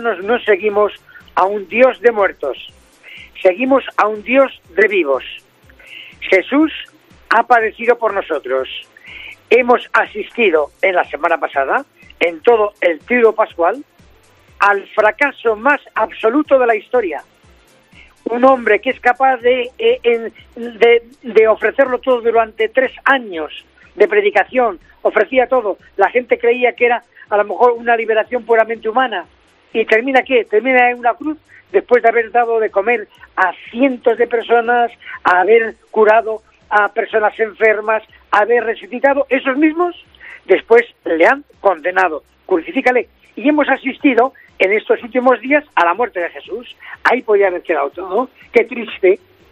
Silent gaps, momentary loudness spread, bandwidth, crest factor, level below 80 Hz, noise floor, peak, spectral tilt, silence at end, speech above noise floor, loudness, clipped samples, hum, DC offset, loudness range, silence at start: none; 10 LU; 8.2 kHz; 16 dB; -56 dBFS; -49 dBFS; 0 dBFS; -5 dB/octave; 0.35 s; 34 dB; -15 LUFS; under 0.1%; none; under 0.1%; 2 LU; 0 s